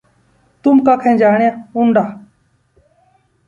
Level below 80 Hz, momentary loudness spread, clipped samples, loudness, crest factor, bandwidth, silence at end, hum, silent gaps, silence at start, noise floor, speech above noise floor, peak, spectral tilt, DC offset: -58 dBFS; 7 LU; under 0.1%; -13 LUFS; 14 dB; 7.2 kHz; 1.3 s; none; none; 0.65 s; -57 dBFS; 45 dB; 0 dBFS; -8.5 dB/octave; under 0.1%